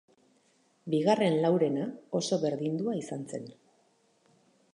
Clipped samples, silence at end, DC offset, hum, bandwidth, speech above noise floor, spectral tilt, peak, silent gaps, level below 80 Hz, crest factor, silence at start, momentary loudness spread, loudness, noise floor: under 0.1%; 1.2 s; under 0.1%; none; 11 kHz; 40 dB; -6 dB/octave; -12 dBFS; none; -80 dBFS; 20 dB; 0.85 s; 15 LU; -30 LUFS; -68 dBFS